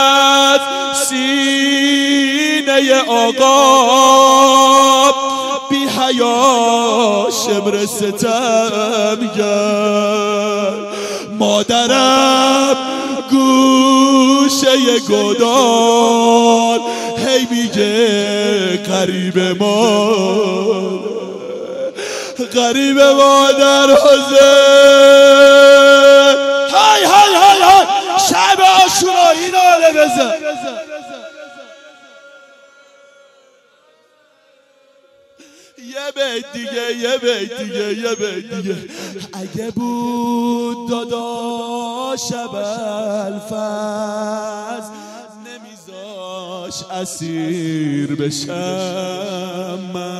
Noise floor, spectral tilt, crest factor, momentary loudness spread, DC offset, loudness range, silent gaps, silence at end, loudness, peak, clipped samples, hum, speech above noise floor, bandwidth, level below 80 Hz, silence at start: -53 dBFS; -3 dB/octave; 12 dB; 17 LU; under 0.1%; 17 LU; none; 0 s; -11 LUFS; 0 dBFS; under 0.1%; none; 41 dB; 15.5 kHz; -58 dBFS; 0 s